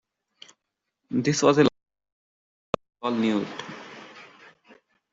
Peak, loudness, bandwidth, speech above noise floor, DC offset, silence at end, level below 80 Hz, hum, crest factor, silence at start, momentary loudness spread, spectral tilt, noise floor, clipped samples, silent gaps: -4 dBFS; -24 LUFS; 8 kHz; 60 dB; under 0.1%; 0.9 s; -64 dBFS; none; 24 dB; 1.1 s; 23 LU; -5 dB/octave; -82 dBFS; under 0.1%; 2.12-2.73 s